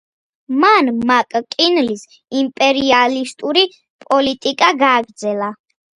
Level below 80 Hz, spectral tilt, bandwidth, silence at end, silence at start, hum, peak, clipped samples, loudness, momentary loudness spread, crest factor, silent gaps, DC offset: -58 dBFS; -3 dB/octave; 11 kHz; 0.4 s; 0.5 s; none; 0 dBFS; under 0.1%; -15 LUFS; 10 LU; 16 dB; 3.90-3.99 s; under 0.1%